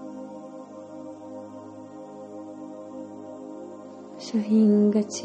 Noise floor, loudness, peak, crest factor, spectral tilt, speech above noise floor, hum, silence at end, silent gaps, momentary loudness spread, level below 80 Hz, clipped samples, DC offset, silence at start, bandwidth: -42 dBFS; -22 LUFS; -12 dBFS; 16 dB; -7 dB/octave; 21 dB; none; 0 s; none; 22 LU; -76 dBFS; under 0.1%; under 0.1%; 0 s; 8.6 kHz